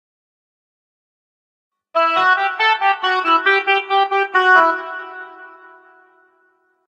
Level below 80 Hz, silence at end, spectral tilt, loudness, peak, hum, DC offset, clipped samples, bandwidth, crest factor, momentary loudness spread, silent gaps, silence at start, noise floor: -80 dBFS; 1.4 s; -2 dB/octave; -15 LUFS; -2 dBFS; none; under 0.1%; under 0.1%; 9.2 kHz; 18 dB; 17 LU; none; 1.95 s; -61 dBFS